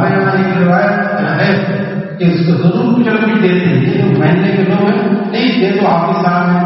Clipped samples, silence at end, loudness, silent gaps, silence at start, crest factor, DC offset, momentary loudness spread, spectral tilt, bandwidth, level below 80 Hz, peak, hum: under 0.1%; 0 s; -12 LUFS; none; 0 s; 12 dB; under 0.1%; 3 LU; -6 dB/octave; 5.8 kHz; -52 dBFS; 0 dBFS; none